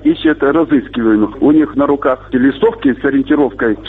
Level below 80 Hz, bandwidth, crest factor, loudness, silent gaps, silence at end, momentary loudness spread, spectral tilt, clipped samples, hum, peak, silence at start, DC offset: -40 dBFS; 4.1 kHz; 10 dB; -13 LUFS; none; 0 s; 3 LU; -9 dB/octave; under 0.1%; none; -2 dBFS; 0 s; under 0.1%